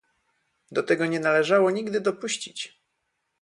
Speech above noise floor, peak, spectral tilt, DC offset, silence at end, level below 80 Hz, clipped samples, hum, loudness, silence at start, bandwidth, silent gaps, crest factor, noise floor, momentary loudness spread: 53 dB; -8 dBFS; -4 dB/octave; under 0.1%; 0.75 s; -74 dBFS; under 0.1%; none; -24 LUFS; 0.7 s; 11.5 kHz; none; 18 dB; -77 dBFS; 13 LU